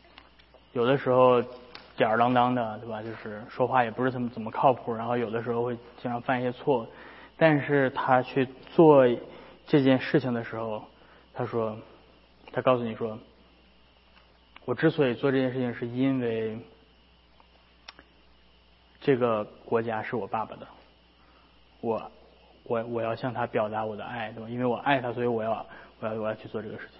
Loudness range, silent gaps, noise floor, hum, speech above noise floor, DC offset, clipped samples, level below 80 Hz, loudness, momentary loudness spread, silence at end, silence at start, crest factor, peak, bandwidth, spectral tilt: 9 LU; none; -59 dBFS; none; 33 dB; under 0.1%; under 0.1%; -64 dBFS; -27 LUFS; 15 LU; 0.15 s; 0.75 s; 24 dB; -4 dBFS; 5.8 kHz; -11 dB/octave